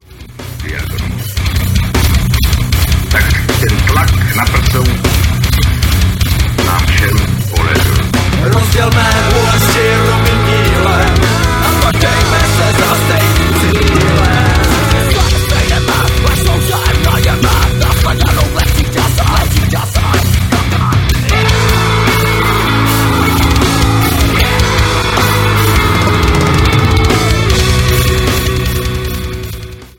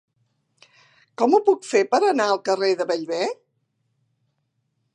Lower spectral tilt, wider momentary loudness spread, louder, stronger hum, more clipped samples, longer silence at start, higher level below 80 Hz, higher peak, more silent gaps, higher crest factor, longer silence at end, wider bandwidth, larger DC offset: about the same, -4.5 dB/octave vs -3.5 dB/octave; second, 4 LU vs 8 LU; first, -11 LUFS vs -21 LUFS; neither; neither; second, 0.1 s vs 1.2 s; first, -16 dBFS vs -82 dBFS; first, 0 dBFS vs -4 dBFS; neither; second, 10 dB vs 20 dB; second, 0.1 s vs 1.6 s; first, 17.5 kHz vs 10 kHz; neither